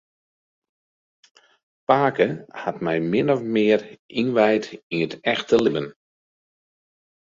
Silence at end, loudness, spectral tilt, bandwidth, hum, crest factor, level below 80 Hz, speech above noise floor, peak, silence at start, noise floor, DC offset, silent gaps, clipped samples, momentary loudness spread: 1.4 s; -22 LUFS; -6.5 dB/octave; 7.6 kHz; none; 22 dB; -64 dBFS; over 69 dB; -2 dBFS; 1.9 s; under -90 dBFS; under 0.1%; 3.99-4.09 s, 4.83-4.90 s; under 0.1%; 10 LU